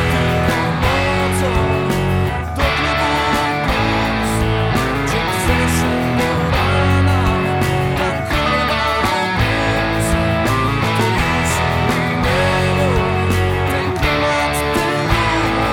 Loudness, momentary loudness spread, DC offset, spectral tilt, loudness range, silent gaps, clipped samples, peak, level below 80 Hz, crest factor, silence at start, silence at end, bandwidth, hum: -16 LUFS; 2 LU; under 0.1%; -5.5 dB/octave; 1 LU; none; under 0.1%; -2 dBFS; -28 dBFS; 14 dB; 0 s; 0 s; 18.5 kHz; none